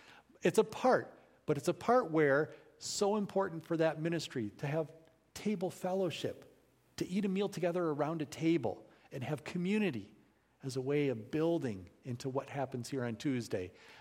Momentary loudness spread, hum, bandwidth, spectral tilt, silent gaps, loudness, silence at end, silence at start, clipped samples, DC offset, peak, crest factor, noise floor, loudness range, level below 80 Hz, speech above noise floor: 14 LU; none; 16.5 kHz; -6 dB/octave; none; -35 LUFS; 0 s; 0.1 s; under 0.1%; under 0.1%; -16 dBFS; 20 dB; -67 dBFS; 5 LU; -74 dBFS; 33 dB